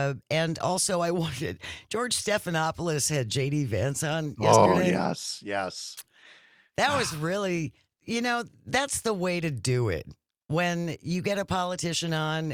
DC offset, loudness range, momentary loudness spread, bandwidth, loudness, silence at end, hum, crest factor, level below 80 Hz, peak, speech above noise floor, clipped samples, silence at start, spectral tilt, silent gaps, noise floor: under 0.1%; 4 LU; 9 LU; 18 kHz; -27 LUFS; 0 s; none; 24 dB; -58 dBFS; -4 dBFS; 30 dB; under 0.1%; 0 s; -4.5 dB/octave; none; -57 dBFS